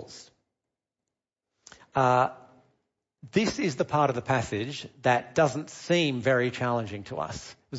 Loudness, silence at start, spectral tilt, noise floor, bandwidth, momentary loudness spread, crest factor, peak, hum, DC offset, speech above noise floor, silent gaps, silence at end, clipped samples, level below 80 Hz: -27 LUFS; 0 s; -5.5 dB/octave; -88 dBFS; 8 kHz; 12 LU; 18 dB; -10 dBFS; none; under 0.1%; 61 dB; none; 0 s; under 0.1%; -60 dBFS